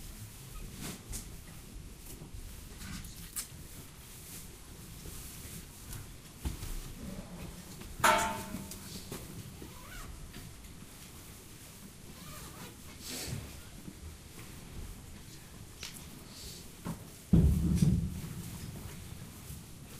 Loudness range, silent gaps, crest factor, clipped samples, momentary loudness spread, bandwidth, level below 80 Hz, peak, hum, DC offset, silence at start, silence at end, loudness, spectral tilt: 14 LU; none; 26 dB; under 0.1%; 20 LU; 15.5 kHz; -46 dBFS; -12 dBFS; none; under 0.1%; 0 s; 0 s; -38 LUFS; -5 dB/octave